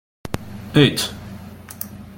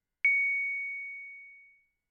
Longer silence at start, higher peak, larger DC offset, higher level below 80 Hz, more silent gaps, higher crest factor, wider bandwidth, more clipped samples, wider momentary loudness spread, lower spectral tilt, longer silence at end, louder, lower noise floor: about the same, 0.25 s vs 0.25 s; first, -2 dBFS vs -18 dBFS; neither; first, -46 dBFS vs -90 dBFS; neither; first, 22 dB vs 16 dB; first, 17 kHz vs 6.8 kHz; neither; about the same, 21 LU vs 20 LU; first, -5 dB/octave vs 5.5 dB/octave; second, 0.05 s vs 0.5 s; first, -19 LUFS vs -28 LUFS; second, -37 dBFS vs -63 dBFS